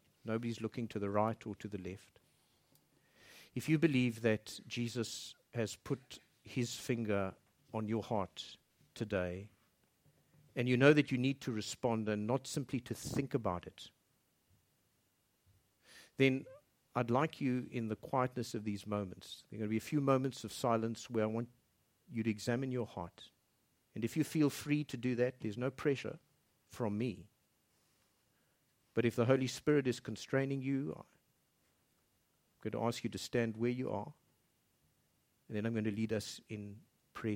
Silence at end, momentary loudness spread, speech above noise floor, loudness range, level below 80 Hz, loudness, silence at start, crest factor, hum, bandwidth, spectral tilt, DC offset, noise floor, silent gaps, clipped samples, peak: 0 s; 15 LU; 41 dB; 7 LU; -72 dBFS; -37 LUFS; 0.25 s; 24 dB; none; 16.5 kHz; -6 dB/octave; under 0.1%; -78 dBFS; none; under 0.1%; -14 dBFS